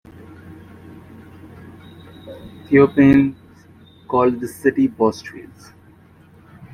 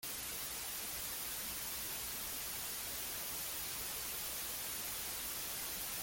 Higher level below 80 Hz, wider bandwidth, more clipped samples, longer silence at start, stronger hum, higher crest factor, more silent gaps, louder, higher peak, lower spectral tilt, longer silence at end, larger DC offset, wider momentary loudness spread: first, -50 dBFS vs -62 dBFS; second, 13 kHz vs 17 kHz; neither; first, 0.5 s vs 0 s; neither; about the same, 18 dB vs 14 dB; neither; first, -16 LUFS vs -40 LUFS; first, -2 dBFS vs -28 dBFS; first, -8 dB/octave vs 0 dB/octave; first, 1.3 s vs 0 s; neither; first, 28 LU vs 1 LU